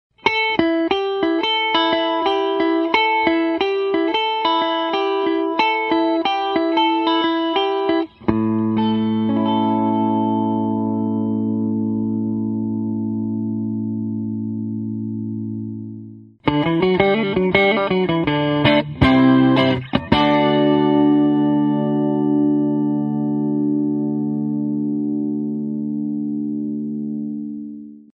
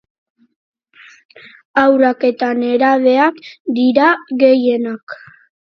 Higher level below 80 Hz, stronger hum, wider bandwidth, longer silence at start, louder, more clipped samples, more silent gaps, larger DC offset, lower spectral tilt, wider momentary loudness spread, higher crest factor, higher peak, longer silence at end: first, -46 dBFS vs -66 dBFS; neither; about the same, 6.2 kHz vs 6.2 kHz; second, 0.25 s vs 1.75 s; second, -19 LUFS vs -14 LUFS; neither; second, none vs 3.60-3.65 s, 5.03-5.07 s; neither; first, -8 dB/octave vs -6 dB/octave; second, 9 LU vs 14 LU; about the same, 18 dB vs 16 dB; about the same, 0 dBFS vs 0 dBFS; second, 0.2 s vs 0.6 s